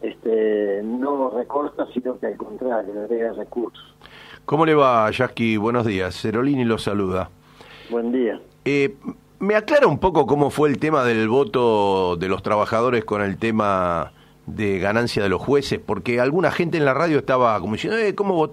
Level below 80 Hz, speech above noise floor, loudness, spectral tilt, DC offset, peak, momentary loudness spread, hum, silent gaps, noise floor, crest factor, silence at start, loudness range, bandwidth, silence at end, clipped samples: -50 dBFS; 25 dB; -21 LUFS; -6.5 dB/octave; under 0.1%; -2 dBFS; 9 LU; none; none; -45 dBFS; 18 dB; 0 s; 5 LU; 13.5 kHz; 0 s; under 0.1%